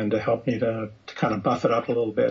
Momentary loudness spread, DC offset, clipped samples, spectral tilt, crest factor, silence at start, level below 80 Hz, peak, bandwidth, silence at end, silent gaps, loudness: 5 LU; under 0.1%; under 0.1%; -7.5 dB/octave; 16 dB; 0 s; -58 dBFS; -8 dBFS; 7.6 kHz; 0 s; none; -25 LUFS